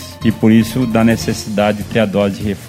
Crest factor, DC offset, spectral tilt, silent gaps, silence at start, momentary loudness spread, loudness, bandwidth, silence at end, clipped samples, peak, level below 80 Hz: 14 dB; under 0.1%; -6 dB/octave; none; 0 s; 6 LU; -14 LUFS; 16 kHz; 0 s; under 0.1%; 0 dBFS; -38 dBFS